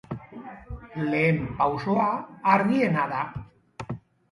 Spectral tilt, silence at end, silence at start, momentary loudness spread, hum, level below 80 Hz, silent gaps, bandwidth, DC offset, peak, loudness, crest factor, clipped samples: -8 dB/octave; 0.35 s; 0.1 s; 20 LU; none; -50 dBFS; none; 11.5 kHz; under 0.1%; -6 dBFS; -24 LUFS; 22 dB; under 0.1%